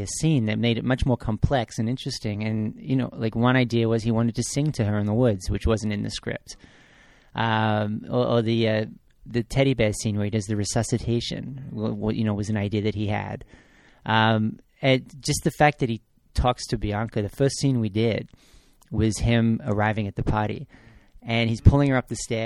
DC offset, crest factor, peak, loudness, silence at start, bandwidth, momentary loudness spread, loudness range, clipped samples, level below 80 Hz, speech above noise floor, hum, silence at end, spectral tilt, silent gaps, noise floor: under 0.1%; 22 dB; -2 dBFS; -24 LUFS; 0 s; 13.5 kHz; 10 LU; 3 LU; under 0.1%; -38 dBFS; 31 dB; none; 0 s; -6 dB/octave; none; -54 dBFS